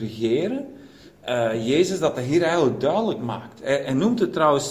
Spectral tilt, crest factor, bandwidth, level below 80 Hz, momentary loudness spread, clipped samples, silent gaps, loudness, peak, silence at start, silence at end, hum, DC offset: -5.5 dB/octave; 18 dB; 15.5 kHz; -58 dBFS; 11 LU; under 0.1%; none; -22 LUFS; -4 dBFS; 0 s; 0 s; none; under 0.1%